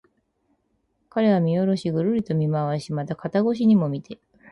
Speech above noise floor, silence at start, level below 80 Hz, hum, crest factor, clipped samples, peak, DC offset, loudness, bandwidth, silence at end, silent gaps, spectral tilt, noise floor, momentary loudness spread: 49 dB; 1.15 s; -62 dBFS; none; 14 dB; under 0.1%; -10 dBFS; under 0.1%; -23 LUFS; 11 kHz; 0.35 s; none; -8.5 dB/octave; -70 dBFS; 11 LU